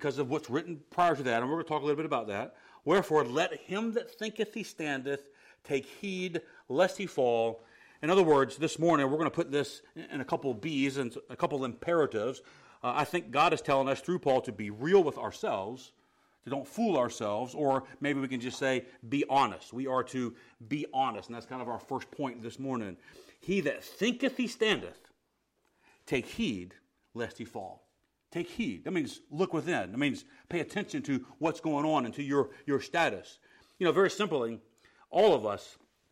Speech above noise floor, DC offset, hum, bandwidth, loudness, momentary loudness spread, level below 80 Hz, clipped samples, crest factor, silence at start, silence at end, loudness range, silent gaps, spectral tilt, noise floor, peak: 46 dB; under 0.1%; none; 16 kHz; -32 LUFS; 13 LU; -70 dBFS; under 0.1%; 20 dB; 0 s; 0.4 s; 6 LU; none; -5.5 dB/octave; -78 dBFS; -12 dBFS